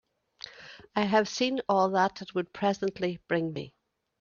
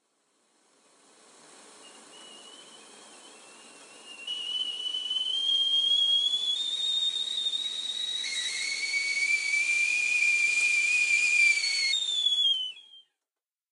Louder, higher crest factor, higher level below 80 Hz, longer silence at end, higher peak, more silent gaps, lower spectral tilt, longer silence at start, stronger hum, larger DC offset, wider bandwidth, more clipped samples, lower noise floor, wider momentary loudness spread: second, -29 LUFS vs -25 LUFS; about the same, 20 dB vs 16 dB; first, -68 dBFS vs under -90 dBFS; second, 0.5 s vs 0.7 s; first, -10 dBFS vs -14 dBFS; neither; first, -5 dB/octave vs 4 dB/octave; second, 0.45 s vs 1.6 s; neither; neither; second, 7.2 kHz vs 13.5 kHz; neither; second, -50 dBFS vs under -90 dBFS; first, 19 LU vs 9 LU